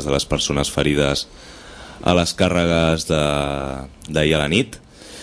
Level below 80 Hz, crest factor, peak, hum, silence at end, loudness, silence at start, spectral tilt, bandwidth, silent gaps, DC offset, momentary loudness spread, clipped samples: -36 dBFS; 18 dB; 0 dBFS; none; 0 s; -19 LUFS; 0 s; -4.5 dB/octave; 11 kHz; none; under 0.1%; 21 LU; under 0.1%